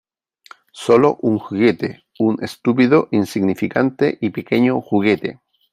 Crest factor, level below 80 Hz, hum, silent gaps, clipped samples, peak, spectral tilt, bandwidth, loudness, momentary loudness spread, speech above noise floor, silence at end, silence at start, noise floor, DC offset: 16 dB; -60 dBFS; none; none; under 0.1%; -2 dBFS; -7 dB/octave; 15 kHz; -17 LUFS; 8 LU; 30 dB; 0.4 s; 0.75 s; -47 dBFS; under 0.1%